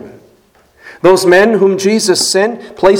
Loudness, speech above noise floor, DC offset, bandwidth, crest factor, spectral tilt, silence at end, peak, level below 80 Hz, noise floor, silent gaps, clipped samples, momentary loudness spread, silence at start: -10 LUFS; 40 dB; under 0.1%; 18 kHz; 12 dB; -3.5 dB/octave; 0 s; 0 dBFS; -48 dBFS; -49 dBFS; none; 0.5%; 6 LU; 0 s